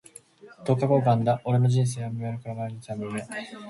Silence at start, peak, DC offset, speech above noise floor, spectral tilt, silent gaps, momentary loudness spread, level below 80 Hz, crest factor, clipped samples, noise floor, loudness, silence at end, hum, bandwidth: 0.45 s; -8 dBFS; under 0.1%; 25 dB; -7.5 dB/octave; none; 13 LU; -62 dBFS; 18 dB; under 0.1%; -50 dBFS; -26 LUFS; 0 s; none; 11.5 kHz